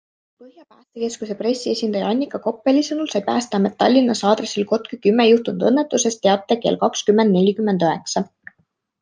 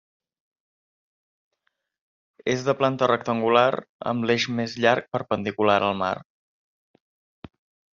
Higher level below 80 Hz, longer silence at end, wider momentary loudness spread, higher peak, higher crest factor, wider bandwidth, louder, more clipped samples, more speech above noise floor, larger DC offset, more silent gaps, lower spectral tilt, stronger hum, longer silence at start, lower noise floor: about the same, -68 dBFS vs -66 dBFS; second, 0.8 s vs 1.7 s; about the same, 9 LU vs 8 LU; about the same, -2 dBFS vs -2 dBFS; second, 18 dB vs 24 dB; first, 10 kHz vs 7.4 kHz; first, -19 LUFS vs -23 LUFS; neither; second, 48 dB vs 53 dB; neither; second, none vs 3.89-3.99 s; first, -5 dB/octave vs -3.5 dB/octave; neither; second, 0.4 s vs 2.45 s; second, -66 dBFS vs -75 dBFS